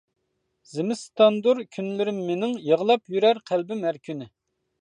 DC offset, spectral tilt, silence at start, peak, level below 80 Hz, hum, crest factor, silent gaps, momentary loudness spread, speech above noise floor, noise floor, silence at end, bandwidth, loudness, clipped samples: under 0.1%; -5.5 dB/octave; 0.75 s; -4 dBFS; -76 dBFS; none; 20 dB; none; 12 LU; 48 dB; -71 dBFS; 0.55 s; 10 kHz; -24 LUFS; under 0.1%